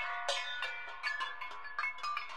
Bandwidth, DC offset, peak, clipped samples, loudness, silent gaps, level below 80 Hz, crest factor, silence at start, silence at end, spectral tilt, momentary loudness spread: 15.5 kHz; 0.4%; -20 dBFS; under 0.1%; -38 LUFS; none; -70 dBFS; 18 dB; 0 s; 0 s; 1.5 dB/octave; 5 LU